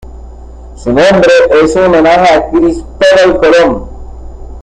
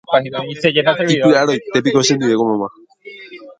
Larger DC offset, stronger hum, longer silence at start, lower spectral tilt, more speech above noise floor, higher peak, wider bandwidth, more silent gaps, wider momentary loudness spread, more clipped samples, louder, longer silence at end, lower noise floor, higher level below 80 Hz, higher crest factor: neither; neither; about the same, 0.05 s vs 0.1 s; about the same, -5 dB/octave vs -4.5 dB/octave; about the same, 21 dB vs 23 dB; about the same, 0 dBFS vs 0 dBFS; about the same, 10 kHz vs 9.4 kHz; neither; second, 8 LU vs 16 LU; neither; first, -7 LUFS vs -15 LUFS; about the same, 0 s vs 0.1 s; second, -28 dBFS vs -38 dBFS; first, -28 dBFS vs -58 dBFS; second, 8 dB vs 16 dB